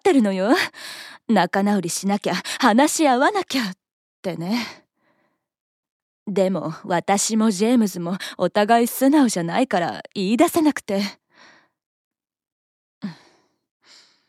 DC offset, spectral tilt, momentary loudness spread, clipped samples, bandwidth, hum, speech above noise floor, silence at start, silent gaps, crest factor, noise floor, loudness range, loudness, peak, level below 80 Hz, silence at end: under 0.1%; -4.5 dB/octave; 14 LU; under 0.1%; 16 kHz; none; 49 dB; 0.05 s; 3.91-4.23 s, 5.60-5.83 s, 5.89-6.26 s, 11.86-12.11 s, 12.52-13.01 s; 20 dB; -69 dBFS; 8 LU; -20 LUFS; -2 dBFS; -72 dBFS; 1.15 s